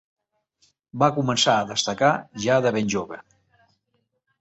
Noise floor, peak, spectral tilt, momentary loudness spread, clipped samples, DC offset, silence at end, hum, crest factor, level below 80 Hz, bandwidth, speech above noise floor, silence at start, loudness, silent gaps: -73 dBFS; -2 dBFS; -4 dB/octave; 13 LU; under 0.1%; under 0.1%; 1.2 s; none; 22 dB; -60 dBFS; 8.4 kHz; 51 dB; 0.95 s; -22 LUFS; none